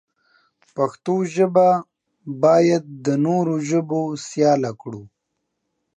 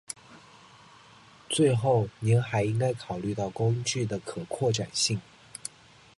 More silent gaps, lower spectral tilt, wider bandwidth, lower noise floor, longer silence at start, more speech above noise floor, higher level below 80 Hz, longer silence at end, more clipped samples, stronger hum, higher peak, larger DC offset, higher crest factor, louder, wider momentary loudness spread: neither; first, -6.5 dB/octave vs -5 dB/octave; second, 9.4 kHz vs 11.5 kHz; first, -76 dBFS vs -54 dBFS; first, 0.75 s vs 0.1 s; first, 58 dB vs 27 dB; second, -70 dBFS vs -60 dBFS; first, 0.9 s vs 0.6 s; neither; neither; first, -4 dBFS vs -12 dBFS; neither; about the same, 16 dB vs 18 dB; first, -20 LUFS vs -28 LUFS; first, 19 LU vs 16 LU